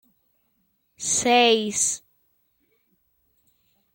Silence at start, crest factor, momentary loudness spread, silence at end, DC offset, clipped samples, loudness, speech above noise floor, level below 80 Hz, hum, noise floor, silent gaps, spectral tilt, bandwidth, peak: 1 s; 20 dB; 13 LU; 1.95 s; under 0.1%; under 0.1%; -20 LUFS; 49 dB; -68 dBFS; none; -70 dBFS; none; -1 dB/octave; 17 kHz; -6 dBFS